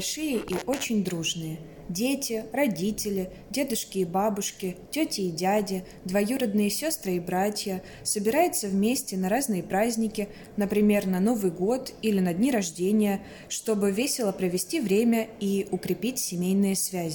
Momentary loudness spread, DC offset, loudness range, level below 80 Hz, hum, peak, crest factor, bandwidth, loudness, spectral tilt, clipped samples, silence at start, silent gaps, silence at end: 8 LU; under 0.1%; 3 LU; -58 dBFS; none; -10 dBFS; 16 dB; 17.5 kHz; -27 LUFS; -4.5 dB/octave; under 0.1%; 0 s; none; 0 s